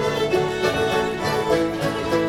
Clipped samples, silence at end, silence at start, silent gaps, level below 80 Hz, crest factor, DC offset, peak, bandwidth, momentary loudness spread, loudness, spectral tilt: under 0.1%; 0 s; 0 s; none; -46 dBFS; 14 dB; under 0.1%; -8 dBFS; 17.5 kHz; 2 LU; -22 LUFS; -5 dB/octave